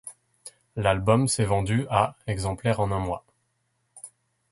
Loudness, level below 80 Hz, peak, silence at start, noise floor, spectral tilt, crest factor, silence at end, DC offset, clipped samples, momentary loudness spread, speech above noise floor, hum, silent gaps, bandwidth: -25 LUFS; -46 dBFS; -6 dBFS; 0.05 s; -73 dBFS; -5.5 dB/octave; 20 dB; 0.45 s; under 0.1%; under 0.1%; 23 LU; 49 dB; none; none; 11.5 kHz